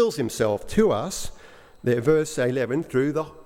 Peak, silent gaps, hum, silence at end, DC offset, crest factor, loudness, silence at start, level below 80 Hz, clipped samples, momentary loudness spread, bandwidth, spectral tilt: -6 dBFS; none; none; 0.05 s; under 0.1%; 18 dB; -24 LUFS; 0 s; -46 dBFS; under 0.1%; 9 LU; 16.5 kHz; -5.5 dB/octave